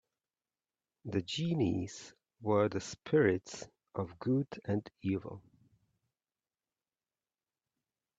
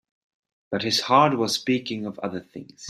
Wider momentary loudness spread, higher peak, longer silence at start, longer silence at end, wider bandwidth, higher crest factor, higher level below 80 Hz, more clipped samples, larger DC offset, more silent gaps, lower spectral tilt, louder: first, 18 LU vs 14 LU; second, -14 dBFS vs -4 dBFS; first, 1.05 s vs 0.7 s; first, 2.8 s vs 0 s; second, 8.4 kHz vs 15 kHz; about the same, 22 dB vs 22 dB; about the same, -70 dBFS vs -68 dBFS; neither; neither; neither; first, -6 dB/octave vs -4 dB/octave; second, -35 LUFS vs -23 LUFS